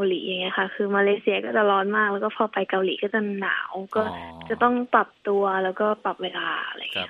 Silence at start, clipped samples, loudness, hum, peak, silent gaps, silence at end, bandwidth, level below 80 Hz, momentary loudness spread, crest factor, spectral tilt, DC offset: 0 s; under 0.1%; -24 LUFS; none; -4 dBFS; none; 0 s; 4.5 kHz; -66 dBFS; 7 LU; 20 dB; -7 dB/octave; under 0.1%